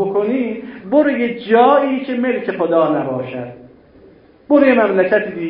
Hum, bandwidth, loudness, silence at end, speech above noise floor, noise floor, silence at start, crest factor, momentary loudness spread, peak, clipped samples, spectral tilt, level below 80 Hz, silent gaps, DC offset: none; 5.4 kHz; -15 LUFS; 0 s; 31 dB; -46 dBFS; 0 s; 16 dB; 12 LU; 0 dBFS; under 0.1%; -11.5 dB/octave; -58 dBFS; none; under 0.1%